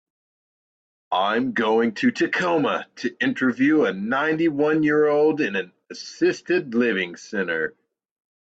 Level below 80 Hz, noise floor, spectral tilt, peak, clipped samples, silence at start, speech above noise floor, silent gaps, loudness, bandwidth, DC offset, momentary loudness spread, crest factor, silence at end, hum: -68 dBFS; under -90 dBFS; -5.5 dB/octave; -8 dBFS; under 0.1%; 1.1 s; over 69 dB; none; -22 LUFS; 8 kHz; under 0.1%; 9 LU; 14 dB; 0.9 s; none